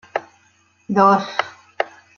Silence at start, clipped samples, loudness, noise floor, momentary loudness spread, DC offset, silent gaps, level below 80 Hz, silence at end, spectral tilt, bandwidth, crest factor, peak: 0.15 s; under 0.1%; -19 LUFS; -58 dBFS; 15 LU; under 0.1%; none; -70 dBFS; 0.3 s; -6 dB/octave; 7 kHz; 20 dB; -2 dBFS